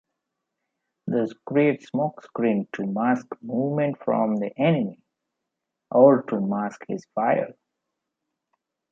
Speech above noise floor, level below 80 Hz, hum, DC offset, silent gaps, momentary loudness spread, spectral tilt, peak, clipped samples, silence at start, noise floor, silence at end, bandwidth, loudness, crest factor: 60 dB; -74 dBFS; none; under 0.1%; none; 13 LU; -8.5 dB/octave; -4 dBFS; under 0.1%; 1.05 s; -83 dBFS; 1.4 s; 7.4 kHz; -24 LUFS; 22 dB